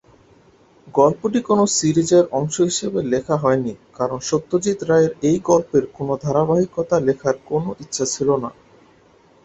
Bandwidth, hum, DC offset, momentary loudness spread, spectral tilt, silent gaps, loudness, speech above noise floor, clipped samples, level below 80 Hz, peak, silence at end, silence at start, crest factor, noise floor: 8.4 kHz; none; under 0.1%; 8 LU; -5 dB/octave; none; -19 LUFS; 34 dB; under 0.1%; -54 dBFS; -2 dBFS; 0.95 s; 0.85 s; 18 dB; -53 dBFS